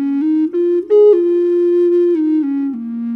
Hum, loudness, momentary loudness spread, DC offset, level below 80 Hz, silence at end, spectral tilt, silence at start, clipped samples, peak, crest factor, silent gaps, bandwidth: none; -14 LUFS; 9 LU; under 0.1%; -66 dBFS; 0 s; -8.5 dB/octave; 0 s; under 0.1%; -2 dBFS; 10 dB; none; 4 kHz